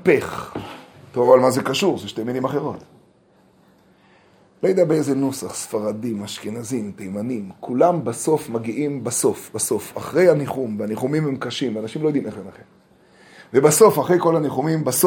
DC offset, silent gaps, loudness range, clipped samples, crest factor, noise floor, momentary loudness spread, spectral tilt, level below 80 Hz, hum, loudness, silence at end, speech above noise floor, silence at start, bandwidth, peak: under 0.1%; none; 5 LU; under 0.1%; 20 dB; -56 dBFS; 15 LU; -5 dB/octave; -62 dBFS; none; -20 LUFS; 0 s; 36 dB; 0 s; 19.5 kHz; 0 dBFS